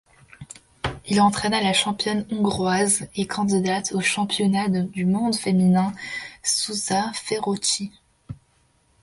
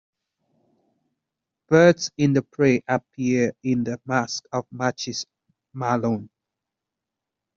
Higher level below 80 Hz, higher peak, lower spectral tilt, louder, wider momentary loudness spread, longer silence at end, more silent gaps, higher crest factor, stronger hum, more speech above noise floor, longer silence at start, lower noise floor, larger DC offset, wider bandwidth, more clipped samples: first, -52 dBFS vs -64 dBFS; second, -6 dBFS vs -2 dBFS; second, -4 dB/octave vs -5.5 dB/octave; about the same, -22 LUFS vs -23 LUFS; about the same, 13 LU vs 13 LU; second, 0.7 s vs 1.3 s; neither; second, 16 dB vs 22 dB; neither; second, 40 dB vs 64 dB; second, 0.4 s vs 1.7 s; second, -62 dBFS vs -85 dBFS; neither; first, 11.5 kHz vs 7.6 kHz; neither